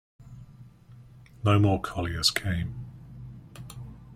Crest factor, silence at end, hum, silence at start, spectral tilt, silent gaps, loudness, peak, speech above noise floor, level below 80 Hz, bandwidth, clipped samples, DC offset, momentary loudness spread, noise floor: 22 dB; 0 s; none; 0.2 s; -5 dB/octave; none; -26 LUFS; -8 dBFS; 26 dB; -50 dBFS; 15.5 kHz; under 0.1%; under 0.1%; 23 LU; -51 dBFS